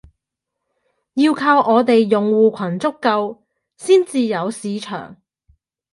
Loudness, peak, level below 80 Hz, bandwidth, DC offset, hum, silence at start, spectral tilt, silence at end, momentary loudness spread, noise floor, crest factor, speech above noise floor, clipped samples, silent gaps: -17 LUFS; -2 dBFS; -62 dBFS; 11.5 kHz; under 0.1%; none; 1.15 s; -5.5 dB/octave; 0.8 s; 14 LU; -81 dBFS; 16 dB; 64 dB; under 0.1%; none